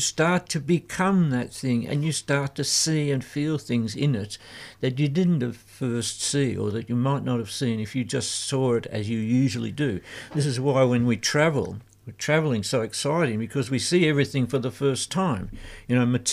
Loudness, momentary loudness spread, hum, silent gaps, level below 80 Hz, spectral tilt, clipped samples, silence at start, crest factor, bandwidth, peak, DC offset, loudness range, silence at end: -25 LUFS; 8 LU; none; none; -54 dBFS; -5 dB/octave; under 0.1%; 0 s; 16 dB; 15 kHz; -8 dBFS; under 0.1%; 2 LU; 0 s